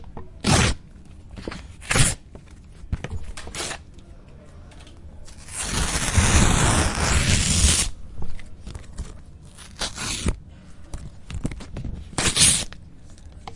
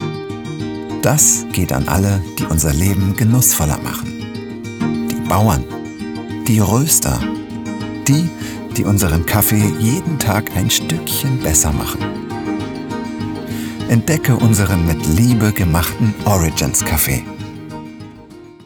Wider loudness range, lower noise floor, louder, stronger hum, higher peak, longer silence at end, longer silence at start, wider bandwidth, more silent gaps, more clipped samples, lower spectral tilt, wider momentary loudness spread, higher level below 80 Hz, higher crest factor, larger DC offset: first, 12 LU vs 3 LU; first, -43 dBFS vs -38 dBFS; second, -21 LUFS vs -16 LUFS; neither; about the same, 0 dBFS vs 0 dBFS; about the same, 0 s vs 0.05 s; about the same, 0 s vs 0 s; second, 11.5 kHz vs over 20 kHz; neither; neither; second, -3 dB/octave vs -4.5 dB/octave; first, 23 LU vs 14 LU; about the same, -32 dBFS vs -32 dBFS; first, 24 dB vs 16 dB; neither